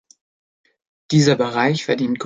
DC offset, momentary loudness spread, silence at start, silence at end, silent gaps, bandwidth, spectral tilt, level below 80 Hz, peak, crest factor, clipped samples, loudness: under 0.1%; 5 LU; 1.1 s; 0 s; none; 9.4 kHz; -5.5 dB/octave; -60 dBFS; -2 dBFS; 18 dB; under 0.1%; -18 LUFS